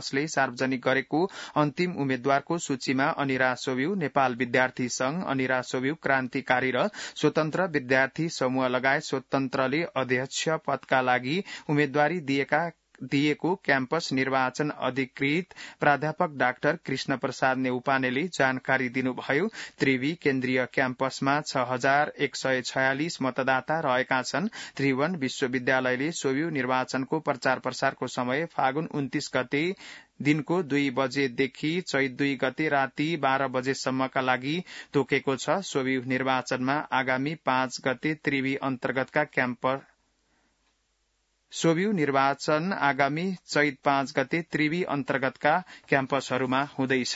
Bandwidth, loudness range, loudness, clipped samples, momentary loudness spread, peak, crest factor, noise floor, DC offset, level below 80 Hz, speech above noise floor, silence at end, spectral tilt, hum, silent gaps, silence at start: 8 kHz; 2 LU; -27 LUFS; under 0.1%; 4 LU; -6 dBFS; 22 dB; -73 dBFS; under 0.1%; -70 dBFS; 46 dB; 0 s; -5 dB/octave; none; none; 0 s